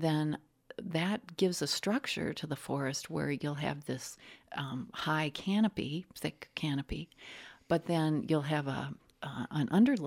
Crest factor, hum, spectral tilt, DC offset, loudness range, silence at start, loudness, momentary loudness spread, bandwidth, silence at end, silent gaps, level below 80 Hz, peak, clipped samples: 18 dB; none; -5.5 dB/octave; under 0.1%; 2 LU; 0 s; -34 LUFS; 13 LU; 16.5 kHz; 0 s; none; -60 dBFS; -16 dBFS; under 0.1%